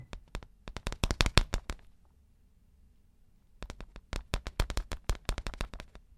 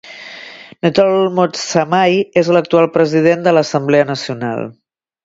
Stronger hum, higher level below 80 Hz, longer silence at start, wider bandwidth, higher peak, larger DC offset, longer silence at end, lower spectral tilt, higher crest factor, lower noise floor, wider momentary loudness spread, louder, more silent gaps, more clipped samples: neither; first, -38 dBFS vs -58 dBFS; about the same, 0 s vs 0.05 s; first, 16 kHz vs 7.8 kHz; about the same, 0 dBFS vs 0 dBFS; neither; second, 0.2 s vs 0.5 s; second, -4 dB/octave vs -5.5 dB/octave; first, 36 dB vs 14 dB; first, -63 dBFS vs -35 dBFS; first, 21 LU vs 18 LU; second, -36 LUFS vs -14 LUFS; neither; neither